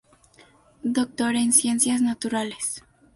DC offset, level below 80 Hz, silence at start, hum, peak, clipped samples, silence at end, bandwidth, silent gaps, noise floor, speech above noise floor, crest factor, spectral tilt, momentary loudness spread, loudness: under 0.1%; -64 dBFS; 0.85 s; none; -4 dBFS; under 0.1%; 0.35 s; 12 kHz; none; -55 dBFS; 32 dB; 22 dB; -2 dB/octave; 11 LU; -23 LUFS